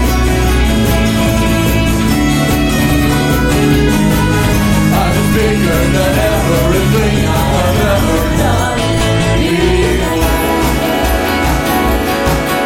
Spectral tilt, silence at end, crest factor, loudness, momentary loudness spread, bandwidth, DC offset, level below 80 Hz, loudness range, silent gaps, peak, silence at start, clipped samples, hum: -5.5 dB/octave; 0 s; 12 dB; -12 LUFS; 2 LU; 16.5 kHz; under 0.1%; -18 dBFS; 1 LU; none; 0 dBFS; 0 s; under 0.1%; none